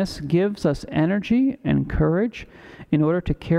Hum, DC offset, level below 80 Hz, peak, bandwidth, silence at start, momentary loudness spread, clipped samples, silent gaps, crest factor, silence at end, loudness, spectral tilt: none; under 0.1%; -38 dBFS; -8 dBFS; 11.5 kHz; 0 s; 5 LU; under 0.1%; none; 14 dB; 0 s; -22 LUFS; -8 dB/octave